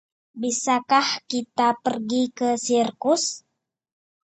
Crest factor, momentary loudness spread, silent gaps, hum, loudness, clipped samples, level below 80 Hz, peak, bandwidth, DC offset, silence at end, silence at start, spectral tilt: 18 dB; 7 LU; none; none; -23 LUFS; under 0.1%; -72 dBFS; -6 dBFS; 9 kHz; under 0.1%; 0.95 s; 0.35 s; -2.5 dB/octave